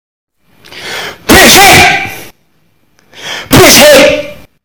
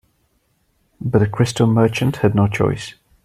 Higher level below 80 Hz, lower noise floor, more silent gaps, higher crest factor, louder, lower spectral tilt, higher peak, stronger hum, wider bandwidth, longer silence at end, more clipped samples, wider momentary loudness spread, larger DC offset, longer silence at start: first, -28 dBFS vs -46 dBFS; second, -54 dBFS vs -64 dBFS; neither; second, 6 dB vs 16 dB; first, -2 LUFS vs -18 LUFS; second, -2.5 dB/octave vs -7 dB/octave; about the same, 0 dBFS vs -2 dBFS; neither; first, over 20 kHz vs 14 kHz; about the same, 0.3 s vs 0.35 s; first, 10% vs under 0.1%; first, 21 LU vs 12 LU; first, 1% vs under 0.1%; second, 0.75 s vs 1 s